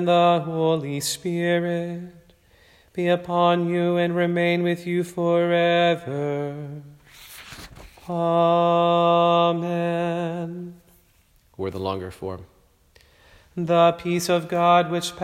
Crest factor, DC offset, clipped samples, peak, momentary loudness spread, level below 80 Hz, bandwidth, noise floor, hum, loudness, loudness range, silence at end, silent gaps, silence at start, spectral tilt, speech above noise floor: 16 dB; under 0.1%; under 0.1%; -6 dBFS; 19 LU; -60 dBFS; 15.5 kHz; -59 dBFS; none; -22 LUFS; 8 LU; 0 s; none; 0 s; -5.5 dB/octave; 38 dB